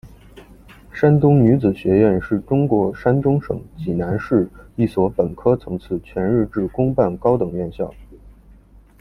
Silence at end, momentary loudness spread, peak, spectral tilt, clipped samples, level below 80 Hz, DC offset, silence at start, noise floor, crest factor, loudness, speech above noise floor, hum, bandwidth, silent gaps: 0.7 s; 12 LU; -2 dBFS; -10.5 dB/octave; under 0.1%; -42 dBFS; under 0.1%; 0.05 s; -47 dBFS; 16 dB; -19 LUFS; 29 dB; none; 5.8 kHz; none